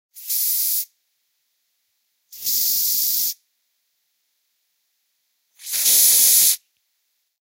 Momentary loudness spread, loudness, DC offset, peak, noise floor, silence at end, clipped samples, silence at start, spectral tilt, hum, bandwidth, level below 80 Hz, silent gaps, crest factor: 15 LU; -16 LUFS; under 0.1%; -2 dBFS; -72 dBFS; 0.9 s; under 0.1%; 0.15 s; 3.5 dB/octave; none; 16.5 kHz; -76 dBFS; none; 22 dB